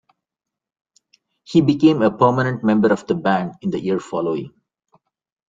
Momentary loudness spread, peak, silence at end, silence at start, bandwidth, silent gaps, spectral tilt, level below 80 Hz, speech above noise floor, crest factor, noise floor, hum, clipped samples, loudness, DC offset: 9 LU; -2 dBFS; 1 s; 1.5 s; 7.6 kHz; none; -7.5 dB/octave; -58 dBFS; 68 dB; 18 dB; -86 dBFS; none; under 0.1%; -18 LUFS; under 0.1%